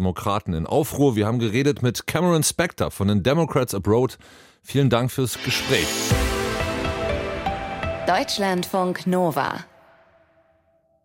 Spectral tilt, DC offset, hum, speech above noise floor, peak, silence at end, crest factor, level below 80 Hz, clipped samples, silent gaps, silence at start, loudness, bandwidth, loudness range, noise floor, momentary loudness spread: -5 dB/octave; under 0.1%; none; 41 dB; -6 dBFS; 1.4 s; 16 dB; -40 dBFS; under 0.1%; none; 0 s; -22 LUFS; 16.5 kHz; 3 LU; -63 dBFS; 7 LU